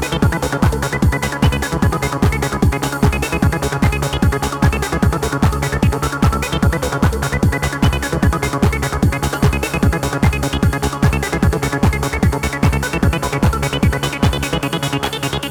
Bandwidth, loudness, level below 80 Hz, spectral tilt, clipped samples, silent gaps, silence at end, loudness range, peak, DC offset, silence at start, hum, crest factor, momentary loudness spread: over 20 kHz; -17 LUFS; -22 dBFS; -5.5 dB/octave; under 0.1%; none; 0 s; 0 LU; 0 dBFS; 0.1%; 0 s; none; 14 dB; 1 LU